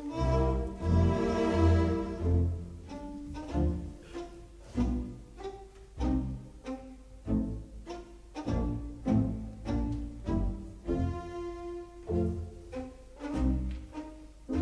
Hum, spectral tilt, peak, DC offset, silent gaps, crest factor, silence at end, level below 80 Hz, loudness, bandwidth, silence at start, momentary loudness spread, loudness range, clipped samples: none; -8.5 dB/octave; -14 dBFS; under 0.1%; none; 18 dB; 0 s; -38 dBFS; -33 LUFS; 10 kHz; 0 s; 16 LU; 7 LU; under 0.1%